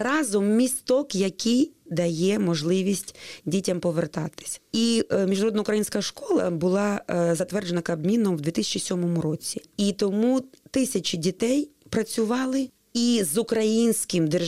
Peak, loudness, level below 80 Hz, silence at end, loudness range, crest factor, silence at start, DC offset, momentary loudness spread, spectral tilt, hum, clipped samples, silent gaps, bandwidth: -12 dBFS; -25 LUFS; -62 dBFS; 0 s; 1 LU; 12 dB; 0 s; 0.1%; 7 LU; -5 dB/octave; none; under 0.1%; none; 16 kHz